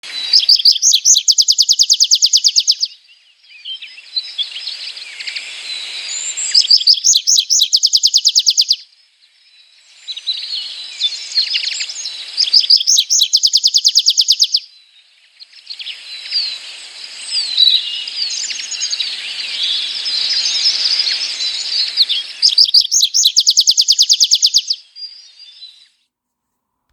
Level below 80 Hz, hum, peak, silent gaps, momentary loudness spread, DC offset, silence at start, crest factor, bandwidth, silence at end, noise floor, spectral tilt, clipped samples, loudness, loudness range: -68 dBFS; none; 0 dBFS; none; 17 LU; under 0.1%; 0.05 s; 16 dB; over 20 kHz; 1.25 s; -75 dBFS; 6 dB/octave; under 0.1%; -11 LUFS; 9 LU